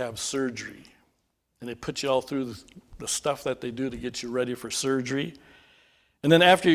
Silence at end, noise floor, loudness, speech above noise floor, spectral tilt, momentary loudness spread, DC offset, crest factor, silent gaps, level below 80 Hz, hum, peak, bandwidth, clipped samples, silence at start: 0 s; -74 dBFS; -27 LUFS; 48 dB; -4 dB/octave; 17 LU; under 0.1%; 24 dB; none; -58 dBFS; none; -4 dBFS; 16 kHz; under 0.1%; 0 s